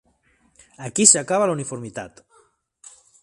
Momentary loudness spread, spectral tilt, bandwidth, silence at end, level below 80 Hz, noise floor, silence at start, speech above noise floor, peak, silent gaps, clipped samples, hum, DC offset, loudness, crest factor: 23 LU; -2.5 dB/octave; 12.5 kHz; 1.15 s; -64 dBFS; -62 dBFS; 0.8 s; 42 dB; 0 dBFS; none; under 0.1%; none; under 0.1%; -17 LUFS; 24 dB